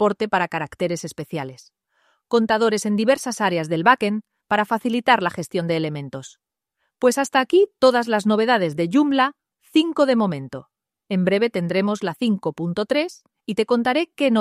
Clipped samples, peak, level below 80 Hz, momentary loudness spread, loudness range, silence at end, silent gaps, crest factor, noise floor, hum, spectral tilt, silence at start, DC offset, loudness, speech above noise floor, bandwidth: under 0.1%; -2 dBFS; -64 dBFS; 12 LU; 4 LU; 0 s; none; 20 dB; -75 dBFS; none; -5 dB/octave; 0 s; under 0.1%; -21 LUFS; 55 dB; 14.5 kHz